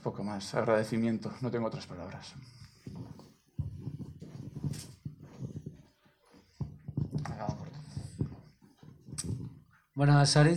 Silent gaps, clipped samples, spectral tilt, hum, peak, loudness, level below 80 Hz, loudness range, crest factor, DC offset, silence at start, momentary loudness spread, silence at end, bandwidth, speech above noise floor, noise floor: none; under 0.1%; -6 dB/octave; none; -14 dBFS; -34 LUFS; -56 dBFS; 9 LU; 20 dB; under 0.1%; 0 s; 19 LU; 0 s; 12.5 kHz; 37 dB; -65 dBFS